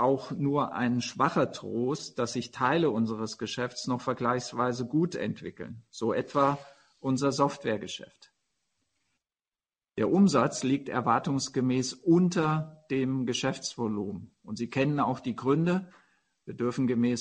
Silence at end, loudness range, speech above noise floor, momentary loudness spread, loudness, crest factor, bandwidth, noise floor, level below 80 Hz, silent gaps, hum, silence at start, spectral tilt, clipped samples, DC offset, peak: 0 s; 5 LU; over 62 dB; 10 LU; -29 LUFS; 20 dB; 9.8 kHz; under -90 dBFS; -66 dBFS; none; none; 0 s; -5.5 dB/octave; under 0.1%; under 0.1%; -10 dBFS